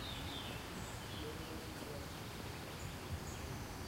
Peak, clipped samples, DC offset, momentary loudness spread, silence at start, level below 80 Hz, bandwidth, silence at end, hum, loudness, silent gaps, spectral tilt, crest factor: -32 dBFS; under 0.1%; under 0.1%; 3 LU; 0 s; -56 dBFS; 16 kHz; 0 s; none; -46 LUFS; none; -4 dB/octave; 14 dB